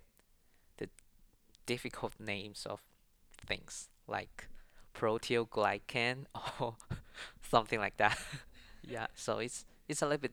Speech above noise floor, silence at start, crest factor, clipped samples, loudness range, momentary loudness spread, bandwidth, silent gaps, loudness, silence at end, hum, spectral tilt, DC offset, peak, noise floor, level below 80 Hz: 31 dB; 0.8 s; 28 dB; under 0.1%; 8 LU; 16 LU; over 20 kHz; none; -37 LUFS; 0 s; none; -4 dB/octave; under 0.1%; -10 dBFS; -68 dBFS; -60 dBFS